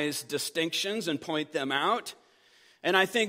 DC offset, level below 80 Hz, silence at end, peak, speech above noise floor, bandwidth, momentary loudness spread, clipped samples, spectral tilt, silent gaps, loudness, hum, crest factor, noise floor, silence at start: under 0.1%; -80 dBFS; 0 s; -8 dBFS; 32 dB; 16 kHz; 7 LU; under 0.1%; -3 dB/octave; none; -29 LUFS; none; 22 dB; -61 dBFS; 0 s